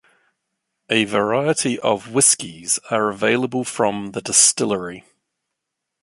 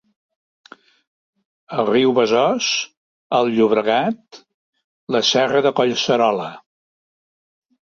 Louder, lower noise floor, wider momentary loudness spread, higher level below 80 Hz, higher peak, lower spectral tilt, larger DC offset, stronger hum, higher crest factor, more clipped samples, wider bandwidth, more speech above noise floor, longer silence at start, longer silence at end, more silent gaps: about the same, -18 LUFS vs -18 LUFS; second, -81 dBFS vs under -90 dBFS; about the same, 10 LU vs 10 LU; about the same, -62 dBFS vs -64 dBFS; about the same, -2 dBFS vs -2 dBFS; second, -2.5 dB/octave vs -4 dB/octave; neither; neither; about the same, 20 dB vs 18 dB; neither; first, 12 kHz vs 7.6 kHz; second, 61 dB vs over 73 dB; second, 0.9 s vs 1.7 s; second, 1.05 s vs 1.35 s; second, none vs 2.97-3.30 s, 4.54-4.73 s, 4.84-5.07 s